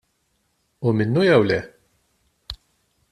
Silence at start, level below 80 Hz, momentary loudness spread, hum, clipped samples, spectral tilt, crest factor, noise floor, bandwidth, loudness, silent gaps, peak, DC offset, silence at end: 0.8 s; -52 dBFS; 21 LU; none; under 0.1%; -7.5 dB/octave; 20 dB; -69 dBFS; 12 kHz; -19 LUFS; none; -4 dBFS; under 0.1%; 0.55 s